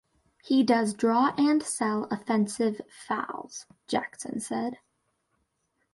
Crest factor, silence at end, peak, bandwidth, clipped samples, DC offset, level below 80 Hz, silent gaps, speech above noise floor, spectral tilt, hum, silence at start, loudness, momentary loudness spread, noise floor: 18 dB; 1.2 s; -12 dBFS; 11.5 kHz; under 0.1%; under 0.1%; -72 dBFS; none; 49 dB; -4.5 dB/octave; none; 0.45 s; -27 LUFS; 13 LU; -76 dBFS